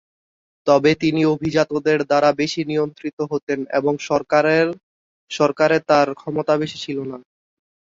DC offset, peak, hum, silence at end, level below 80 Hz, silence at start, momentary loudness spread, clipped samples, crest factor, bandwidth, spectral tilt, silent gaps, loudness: under 0.1%; -2 dBFS; none; 0.7 s; -58 dBFS; 0.65 s; 11 LU; under 0.1%; 18 dB; 7.8 kHz; -5.5 dB/octave; 3.13-3.17 s, 3.43-3.47 s, 4.83-5.27 s; -19 LUFS